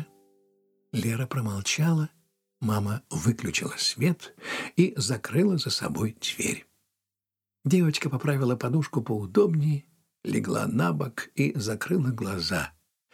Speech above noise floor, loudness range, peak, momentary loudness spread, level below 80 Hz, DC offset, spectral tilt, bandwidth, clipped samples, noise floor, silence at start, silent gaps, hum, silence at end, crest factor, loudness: 63 dB; 2 LU; -8 dBFS; 9 LU; -64 dBFS; under 0.1%; -5 dB/octave; 16.5 kHz; under 0.1%; -89 dBFS; 0 s; none; none; 0.45 s; 20 dB; -27 LUFS